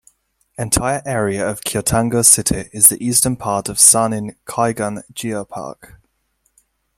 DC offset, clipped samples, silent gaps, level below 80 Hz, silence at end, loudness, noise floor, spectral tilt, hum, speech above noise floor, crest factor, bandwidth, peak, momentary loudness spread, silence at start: under 0.1%; under 0.1%; none; -42 dBFS; 1.25 s; -15 LUFS; -66 dBFS; -3 dB/octave; none; 49 dB; 18 dB; 16.5 kHz; 0 dBFS; 16 LU; 0.6 s